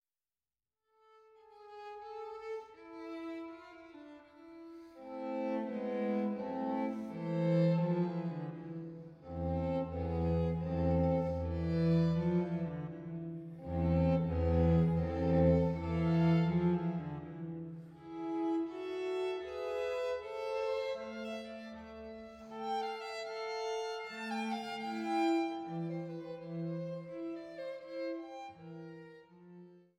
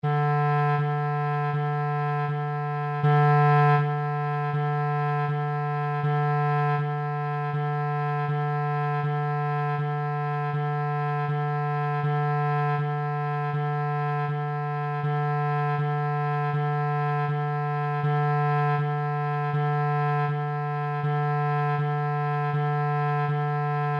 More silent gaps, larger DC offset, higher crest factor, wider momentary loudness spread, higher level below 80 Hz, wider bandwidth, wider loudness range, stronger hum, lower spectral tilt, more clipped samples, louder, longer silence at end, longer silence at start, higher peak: neither; neither; first, 18 dB vs 12 dB; first, 19 LU vs 4 LU; first, -52 dBFS vs -76 dBFS; first, 7.8 kHz vs 5.2 kHz; first, 13 LU vs 3 LU; neither; about the same, -8.5 dB/octave vs -9.5 dB/octave; neither; second, -36 LUFS vs -26 LUFS; first, 0.2 s vs 0 s; first, 1.45 s vs 0.05 s; second, -18 dBFS vs -12 dBFS